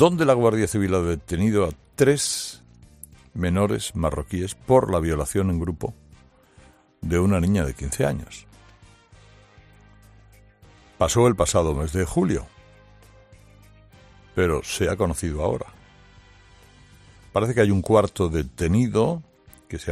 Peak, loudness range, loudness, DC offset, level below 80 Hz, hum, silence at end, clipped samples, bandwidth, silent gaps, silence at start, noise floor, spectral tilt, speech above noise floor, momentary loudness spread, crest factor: -2 dBFS; 4 LU; -23 LUFS; under 0.1%; -42 dBFS; none; 0 s; under 0.1%; 15 kHz; none; 0 s; -53 dBFS; -5.5 dB/octave; 32 dB; 13 LU; 22 dB